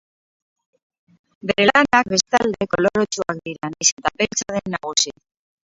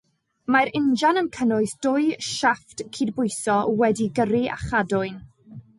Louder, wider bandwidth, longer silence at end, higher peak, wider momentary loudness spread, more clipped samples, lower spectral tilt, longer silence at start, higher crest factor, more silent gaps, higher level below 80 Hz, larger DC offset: first, -19 LUFS vs -23 LUFS; second, 8 kHz vs 11.5 kHz; first, 0.55 s vs 0.2 s; first, 0 dBFS vs -8 dBFS; about the same, 10 LU vs 8 LU; neither; second, -2.5 dB/octave vs -4.5 dB/octave; first, 1.45 s vs 0.5 s; first, 22 dB vs 16 dB; first, 3.92-3.97 s vs none; about the same, -54 dBFS vs -52 dBFS; neither